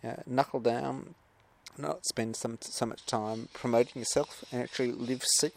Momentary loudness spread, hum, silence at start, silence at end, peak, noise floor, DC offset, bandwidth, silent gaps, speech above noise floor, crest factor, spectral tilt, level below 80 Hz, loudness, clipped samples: 9 LU; none; 0.05 s; 0.05 s; -10 dBFS; -57 dBFS; under 0.1%; 16 kHz; none; 24 dB; 22 dB; -3.5 dB/octave; -68 dBFS; -32 LUFS; under 0.1%